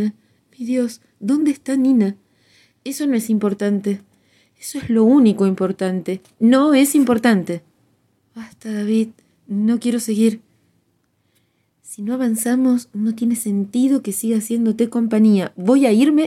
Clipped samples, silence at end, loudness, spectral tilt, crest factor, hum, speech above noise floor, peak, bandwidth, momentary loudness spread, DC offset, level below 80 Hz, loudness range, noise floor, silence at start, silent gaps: under 0.1%; 0 s; -18 LUFS; -5.5 dB/octave; 16 dB; none; 48 dB; -2 dBFS; 15 kHz; 15 LU; under 0.1%; -64 dBFS; 6 LU; -65 dBFS; 0 s; none